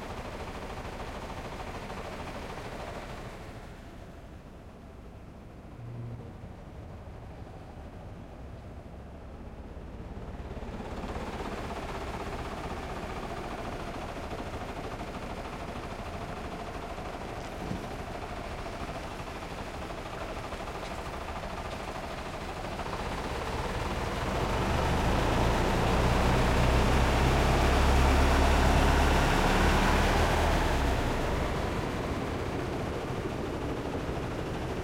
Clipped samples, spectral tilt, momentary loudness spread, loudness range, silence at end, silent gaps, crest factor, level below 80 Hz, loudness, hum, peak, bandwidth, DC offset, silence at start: under 0.1%; -5.5 dB/octave; 20 LU; 20 LU; 0 s; none; 18 dB; -36 dBFS; -31 LUFS; none; -12 dBFS; 16.5 kHz; under 0.1%; 0 s